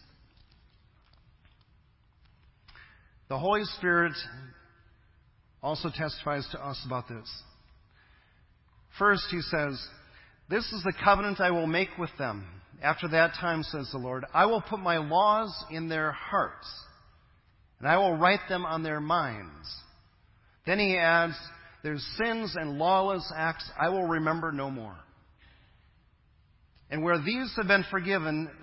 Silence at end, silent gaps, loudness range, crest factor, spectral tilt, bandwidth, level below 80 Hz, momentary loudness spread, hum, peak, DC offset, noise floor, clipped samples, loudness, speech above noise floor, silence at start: 0 s; none; 8 LU; 24 dB; -9 dB/octave; 5.8 kHz; -56 dBFS; 17 LU; none; -6 dBFS; under 0.1%; -64 dBFS; under 0.1%; -28 LUFS; 35 dB; 2.75 s